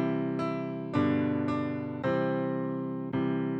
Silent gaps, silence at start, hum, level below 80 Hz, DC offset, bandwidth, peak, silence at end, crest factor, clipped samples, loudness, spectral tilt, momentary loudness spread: none; 0 s; none; -66 dBFS; under 0.1%; 7.6 kHz; -16 dBFS; 0 s; 14 dB; under 0.1%; -31 LUFS; -9 dB/octave; 6 LU